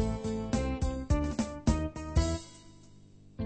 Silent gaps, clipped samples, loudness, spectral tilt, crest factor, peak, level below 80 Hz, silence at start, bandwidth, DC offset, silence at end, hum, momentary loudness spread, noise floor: none; under 0.1%; -33 LUFS; -6.5 dB/octave; 20 dB; -12 dBFS; -36 dBFS; 0 s; 8.8 kHz; under 0.1%; 0 s; 50 Hz at -55 dBFS; 6 LU; -54 dBFS